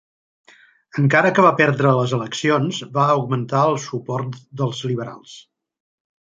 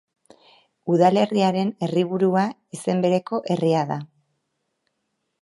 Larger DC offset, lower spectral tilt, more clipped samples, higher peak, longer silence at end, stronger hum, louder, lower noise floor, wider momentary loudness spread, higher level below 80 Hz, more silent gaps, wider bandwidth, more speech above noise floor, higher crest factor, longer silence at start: neither; about the same, -6 dB/octave vs -7 dB/octave; neither; about the same, -2 dBFS vs -4 dBFS; second, 1 s vs 1.35 s; neither; first, -19 LUFS vs -22 LUFS; second, -48 dBFS vs -76 dBFS; about the same, 12 LU vs 10 LU; first, -64 dBFS vs -72 dBFS; neither; second, 7.8 kHz vs 11.5 kHz; second, 30 dB vs 55 dB; about the same, 20 dB vs 18 dB; about the same, 0.95 s vs 0.85 s